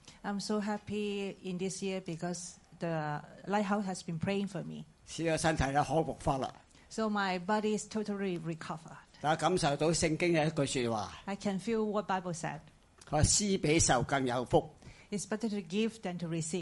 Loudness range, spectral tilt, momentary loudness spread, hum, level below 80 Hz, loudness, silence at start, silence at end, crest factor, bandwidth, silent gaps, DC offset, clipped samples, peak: 6 LU; -4.5 dB/octave; 12 LU; none; -52 dBFS; -33 LUFS; 0.05 s; 0 s; 20 dB; 11.5 kHz; none; under 0.1%; under 0.1%; -14 dBFS